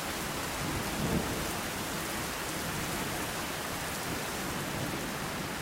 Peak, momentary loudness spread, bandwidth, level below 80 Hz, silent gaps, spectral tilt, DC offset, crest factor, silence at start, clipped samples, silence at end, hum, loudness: -18 dBFS; 3 LU; 16 kHz; -50 dBFS; none; -3.5 dB/octave; under 0.1%; 16 dB; 0 s; under 0.1%; 0 s; none; -34 LUFS